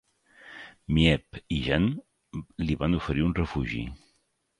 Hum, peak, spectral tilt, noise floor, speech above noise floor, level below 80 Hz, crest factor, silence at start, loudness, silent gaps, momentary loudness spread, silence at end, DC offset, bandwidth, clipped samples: none; -8 dBFS; -7 dB/octave; -72 dBFS; 45 dB; -40 dBFS; 22 dB; 0.45 s; -27 LUFS; none; 19 LU; 0.65 s; under 0.1%; 10.5 kHz; under 0.1%